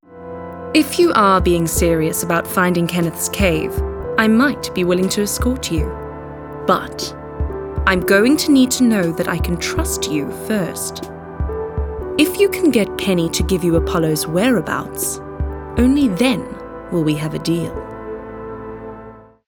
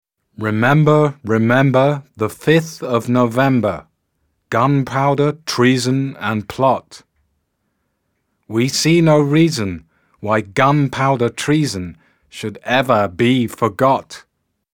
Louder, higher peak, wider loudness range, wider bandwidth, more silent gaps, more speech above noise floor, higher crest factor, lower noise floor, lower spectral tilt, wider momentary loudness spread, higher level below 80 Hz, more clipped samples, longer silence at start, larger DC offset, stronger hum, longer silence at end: about the same, -17 LUFS vs -16 LUFS; about the same, 0 dBFS vs 0 dBFS; about the same, 4 LU vs 3 LU; first, over 20 kHz vs 17.5 kHz; neither; second, 23 dB vs 54 dB; about the same, 18 dB vs 16 dB; second, -39 dBFS vs -69 dBFS; about the same, -5 dB/octave vs -6 dB/octave; first, 17 LU vs 12 LU; first, -30 dBFS vs -54 dBFS; neither; second, 0.1 s vs 0.4 s; neither; neither; second, 0.25 s vs 0.55 s